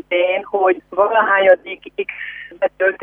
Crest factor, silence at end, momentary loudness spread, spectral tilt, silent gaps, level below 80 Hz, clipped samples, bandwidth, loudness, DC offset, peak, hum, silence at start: 16 dB; 0 s; 14 LU; -6 dB/octave; none; -60 dBFS; under 0.1%; 3.7 kHz; -17 LUFS; under 0.1%; -2 dBFS; none; 0.1 s